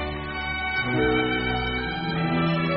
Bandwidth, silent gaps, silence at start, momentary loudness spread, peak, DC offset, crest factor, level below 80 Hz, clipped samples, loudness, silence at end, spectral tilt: 5.6 kHz; none; 0 s; 6 LU; -10 dBFS; 0.2%; 14 dB; -38 dBFS; under 0.1%; -25 LUFS; 0 s; -4 dB/octave